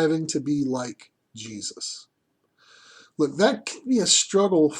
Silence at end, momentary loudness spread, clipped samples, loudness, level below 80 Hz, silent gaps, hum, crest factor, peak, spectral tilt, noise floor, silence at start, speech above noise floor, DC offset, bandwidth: 0 s; 19 LU; under 0.1%; -23 LUFS; -72 dBFS; none; none; 20 dB; -6 dBFS; -3.5 dB/octave; -69 dBFS; 0 s; 46 dB; under 0.1%; 12 kHz